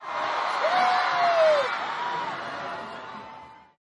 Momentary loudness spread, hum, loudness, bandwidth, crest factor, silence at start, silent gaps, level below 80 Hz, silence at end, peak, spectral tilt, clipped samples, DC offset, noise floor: 19 LU; none; -25 LUFS; 11.5 kHz; 16 dB; 0 s; none; -76 dBFS; 0.4 s; -10 dBFS; -2.5 dB/octave; under 0.1%; under 0.1%; -46 dBFS